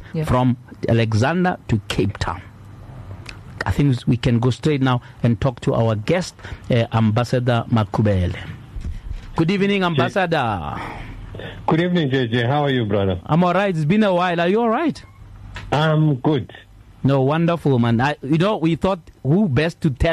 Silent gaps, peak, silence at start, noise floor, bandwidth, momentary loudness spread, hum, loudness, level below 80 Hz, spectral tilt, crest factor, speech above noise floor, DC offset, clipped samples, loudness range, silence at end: none; -6 dBFS; 0 s; -38 dBFS; 12.5 kHz; 16 LU; none; -19 LUFS; -38 dBFS; -7.5 dB/octave; 12 dB; 20 dB; under 0.1%; under 0.1%; 3 LU; 0 s